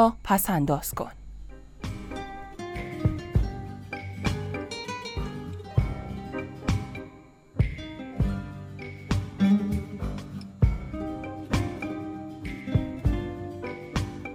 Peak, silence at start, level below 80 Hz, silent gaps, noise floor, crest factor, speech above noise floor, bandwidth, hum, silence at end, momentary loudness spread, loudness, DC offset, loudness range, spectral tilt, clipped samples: -8 dBFS; 0 s; -36 dBFS; none; -50 dBFS; 20 dB; 25 dB; 16 kHz; none; 0 s; 14 LU; -30 LUFS; under 0.1%; 4 LU; -6.5 dB/octave; under 0.1%